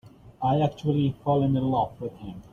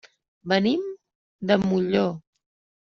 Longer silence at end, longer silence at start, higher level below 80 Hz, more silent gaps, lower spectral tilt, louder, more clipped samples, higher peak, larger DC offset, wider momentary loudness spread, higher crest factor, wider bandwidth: second, 0.1 s vs 0.7 s; second, 0.05 s vs 0.45 s; first, -52 dBFS vs -62 dBFS; second, none vs 1.15-1.39 s; first, -9.5 dB/octave vs -5 dB/octave; about the same, -25 LUFS vs -24 LUFS; neither; second, -10 dBFS vs -6 dBFS; neither; second, 13 LU vs 19 LU; about the same, 16 dB vs 20 dB; about the same, 6.8 kHz vs 6.8 kHz